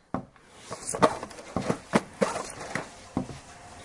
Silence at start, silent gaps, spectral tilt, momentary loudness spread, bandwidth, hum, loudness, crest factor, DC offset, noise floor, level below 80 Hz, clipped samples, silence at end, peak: 0.15 s; none; -4.5 dB/octave; 18 LU; 11.5 kHz; none; -31 LUFS; 30 dB; under 0.1%; -50 dBFS; -56 dBFS; under 0.1%; 0 s; -2 dBFS